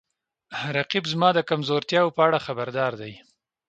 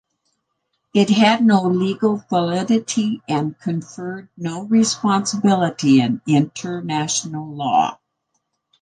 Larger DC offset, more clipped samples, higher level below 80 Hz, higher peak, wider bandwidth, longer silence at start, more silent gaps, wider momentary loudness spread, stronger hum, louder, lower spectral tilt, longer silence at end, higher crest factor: neither; neither; about the same, -68 dBFS vs -64 dBFS; about the same, -4 dBFS vs -2 dBFS; second, 8.8 kHz vs 10 kHz; second, 0.5 s vs 0.95 s; neither; about the same, 13 LU vs 12 LU; neither; second, -23 LUFS vs -19 LUFS; about the same, -5.5 dB/octave vs -5 dB/octave; second, 0.5 s vs 0.9 s; about the same, 20 dB vs 16 dB